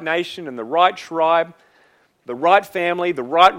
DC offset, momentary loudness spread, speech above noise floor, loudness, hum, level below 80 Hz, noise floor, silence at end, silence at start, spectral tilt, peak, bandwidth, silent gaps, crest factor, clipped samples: under 0.1%; 13 LU; 39 dB; -18 LUFS; none; -64 dBFS; -57 dBFS; 0 s; 0 s; -4.5 dB/octave; 0 dBFS; 16.5 kHz; none; 18 dB; under 0.1%